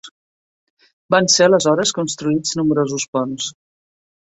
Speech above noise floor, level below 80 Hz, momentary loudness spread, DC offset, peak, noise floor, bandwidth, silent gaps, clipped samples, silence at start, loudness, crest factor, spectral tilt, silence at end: over 73 dB; -60 dBFS; 11 LU; under 0.1%; -2 dBFS; under -90 dBFS; 8.4 kHz; 0.11-0.77 s, 0.93-1.09 s, 3.08-3.13 s; under 0.1%; 0.05 s; -17 LUFS; 18 dB; -3.5 dB/octave; 0.8 s